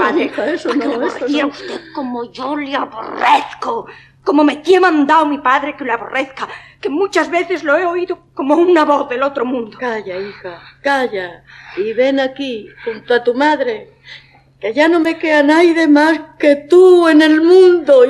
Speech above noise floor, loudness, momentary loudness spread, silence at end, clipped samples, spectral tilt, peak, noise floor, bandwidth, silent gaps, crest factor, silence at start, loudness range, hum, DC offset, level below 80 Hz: 27 dB; -14 LUFS; 16 LU; 0 s; under 0.1%; -4.5 dB/octave; 0 dBFS; -41 dBFS; 11 kHz; none; 14 dB; 0 s; 8 LU; none; under 0.1%; -58 dBFS